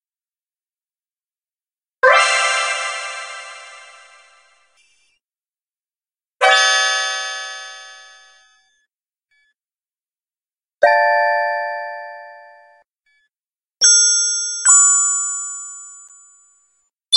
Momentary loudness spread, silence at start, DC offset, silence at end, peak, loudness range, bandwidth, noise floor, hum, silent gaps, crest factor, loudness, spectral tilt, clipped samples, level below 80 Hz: 24 LU; 2.05 s; under 0.1%; 0 s; 0 dBFS; 12 LU; 11.5 kHz; under -90 dBFS; none; 10.53-10.57 s; 20 dB; -14 LUFS; 5 dB/octave; under 0.1%; -72 dBFS